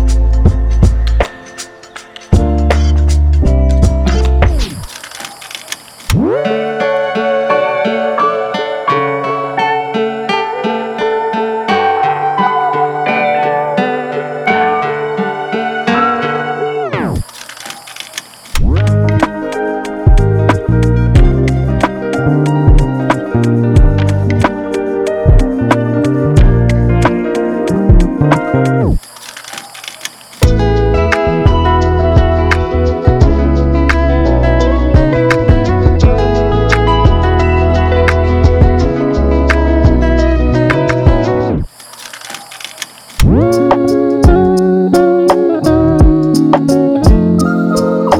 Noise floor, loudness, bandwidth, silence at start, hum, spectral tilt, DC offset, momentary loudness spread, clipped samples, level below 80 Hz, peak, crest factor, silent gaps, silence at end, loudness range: -33 dBFS; -12 LUFS; 14.5 kHz; 0 s; none; -7 dB/octave; under 0.1%; 14 LU; under 0.1%; -16 dBFS; 0 dBFS; 10 dB; none; 0 s; 5 LU